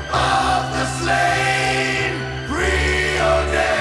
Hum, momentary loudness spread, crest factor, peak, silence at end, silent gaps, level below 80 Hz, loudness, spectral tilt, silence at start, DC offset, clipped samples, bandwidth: none; 5 LU; 14 dB; -4 dBFS; 0 s; none; -30 dBFS; -18 LUFS; -4 dB/octave; 0 s; under 0.1%; under 0.1%; 12 kHz